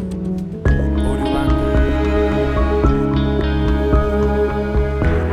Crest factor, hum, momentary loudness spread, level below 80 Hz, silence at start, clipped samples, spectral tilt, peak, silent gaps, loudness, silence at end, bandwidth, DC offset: 14 dB; none; 3 LU; -20 dBFS; 0 s; under 0.1%; -8.5 dB/octave; -2 dBFS; none; -18 LUFS; 0 s; 9.8 kHz; under 0.1%